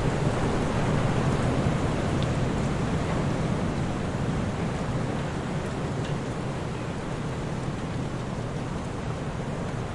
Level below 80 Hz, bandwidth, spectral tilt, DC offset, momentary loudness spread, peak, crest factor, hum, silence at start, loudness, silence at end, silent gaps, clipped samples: -40 dBFS; 11.5 kHz; -6.5 dB/octave; under 0.1%; 7 LU; -12 dBFS; 16 dB; none; 0 s; -29 LUFS; 0 s; none; under 0.1%